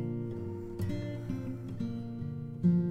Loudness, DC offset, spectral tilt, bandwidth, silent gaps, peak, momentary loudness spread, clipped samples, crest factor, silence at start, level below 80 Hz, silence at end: -36 LUFS; under 0.1%; -9.5 dB/octave; 6.6 kHz; none; -18 dBFS; 10 LU; under 0.1%; 16 dB; 0 s; -54 dBFS; 0 s